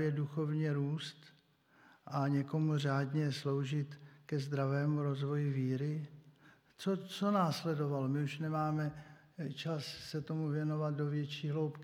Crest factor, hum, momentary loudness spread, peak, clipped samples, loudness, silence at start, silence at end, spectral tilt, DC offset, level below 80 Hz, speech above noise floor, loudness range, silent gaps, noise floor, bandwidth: 18 dB; none; 8 LU; -20 dBFS; under 0.1%; -37 LUFS; 0 s; 0 s; -7.5 dB/octave; under 0.1%; -78 dBFS; 32 dB; 2 LU; none; -68 dBFS; 12.5 kHz